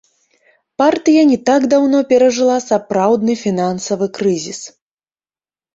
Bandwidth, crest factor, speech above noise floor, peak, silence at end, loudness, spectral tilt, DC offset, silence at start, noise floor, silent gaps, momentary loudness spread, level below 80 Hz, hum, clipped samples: 8 kHz; 14 dB; over 77 dB; -2 dBFS; 1.05 s; -14 LUFS; -5 dB/octave; under 0.1%; 0.8 s; under -90 dBFS; none; 10 LU; -60 dBFS; none; under 0.1%